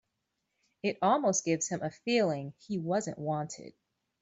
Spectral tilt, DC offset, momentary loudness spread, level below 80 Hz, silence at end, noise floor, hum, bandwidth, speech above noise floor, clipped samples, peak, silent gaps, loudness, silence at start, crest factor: -4.5 dB/octave; under 0.1%; 10 LU; -74 dBFS; 0.5 s; -83 dBFS; none; 8.2 kHz; 52 dB; under 0.1%; -14 dBFS; none; -31 LUFS; 0.85 s; 18 dB